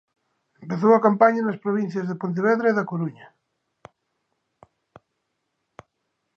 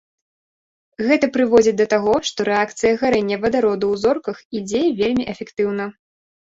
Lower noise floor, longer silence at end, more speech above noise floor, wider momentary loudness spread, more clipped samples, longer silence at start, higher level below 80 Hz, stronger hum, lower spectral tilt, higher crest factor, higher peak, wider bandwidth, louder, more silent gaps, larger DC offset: second, -77 dBFS vs under -90 dBFS; first, 3.1 s vs 0.6 s; second, 56 dB vs over 72 dB; about the same, 12 LU vs 10 LU; neither; second, 0.6 s vs 1 s; second, -74 dBFS vs -54 dBFS; neither; first, -8.5 dB/octave vs -4.5 dB/octave; first, 22 dB vs 16 dB; about the same, -2 dBFS vs -2 dBFS; second, 6.8 kHz vs 8 kHz; about the same, -21 LUFS vs -19 LUFS; second, none vs 4.45-4.51 s; neither